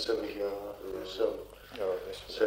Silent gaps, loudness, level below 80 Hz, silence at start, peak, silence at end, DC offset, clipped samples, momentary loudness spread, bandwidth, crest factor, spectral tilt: none; -36 LUFS; -58 dBFS; 0 s; -16 dBFS; 0 s; under 0.1%; under 0.1%; 8 LU; 16 kHz; 18 dB; -4 dB/octave